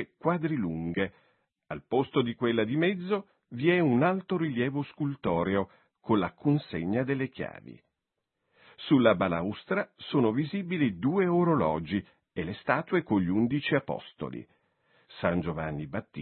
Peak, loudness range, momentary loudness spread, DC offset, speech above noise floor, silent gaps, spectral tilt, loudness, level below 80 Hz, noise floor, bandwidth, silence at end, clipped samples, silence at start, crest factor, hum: -6 dBFS; 3 LU; 13 LU; under 0.1%; 57 dB; none; -11 dB/octave; -29 LUFS; -62 dBFS; -85 dBFS; 4.4 kHz; 0 s; under 0.1%; 0 s; 22 dB; none